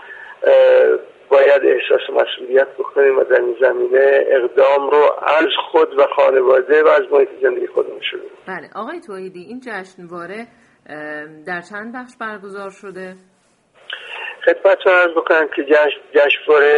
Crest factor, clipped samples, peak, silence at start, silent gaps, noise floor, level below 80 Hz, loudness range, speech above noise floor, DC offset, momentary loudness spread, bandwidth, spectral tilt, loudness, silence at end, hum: 16 dB; under 0.1%; 0 dBFS; 0 s; none; -55 dBFS; -68 dBFS; 16 LU; 39 dB; under 0.1%; 19 LU; 7.2 kHz; -4.5 dB/octave; -14 LUFS; 0 s; none